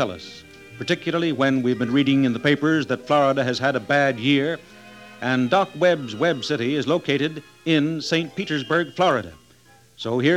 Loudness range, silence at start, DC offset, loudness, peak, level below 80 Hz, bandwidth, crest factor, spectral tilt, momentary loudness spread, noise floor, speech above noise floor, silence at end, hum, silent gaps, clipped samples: 3 LU; 0 s; under 0.1%; -21 LUFS; -4 dBFS; -64 dBFS; 12 kHz; 18 dB; -6 dB/octave; 8 LU; -53 dBFS; 32 dB; 0 s; none; none; under 0.1%